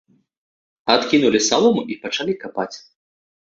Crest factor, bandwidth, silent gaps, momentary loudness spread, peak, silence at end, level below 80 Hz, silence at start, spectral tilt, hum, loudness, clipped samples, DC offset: 20 dB; 7.8 kHz; none; 13 LU; 0 dBFS; 0.7 s; -60 dBFS; 0.85 s; -3 dB/octave; none; -19 LUFS; under 0.1%; under 0.1%